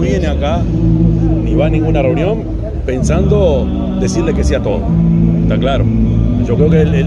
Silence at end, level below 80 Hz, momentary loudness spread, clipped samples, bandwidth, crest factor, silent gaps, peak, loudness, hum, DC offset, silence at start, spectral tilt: 0 s; -18 dBFS; 5 LU; under 0.1%; 9.8 kHz; 12 dB; none; 0 dBFS; -13 LUFS; none; under 0.1%; 0 s; -8 dB/octave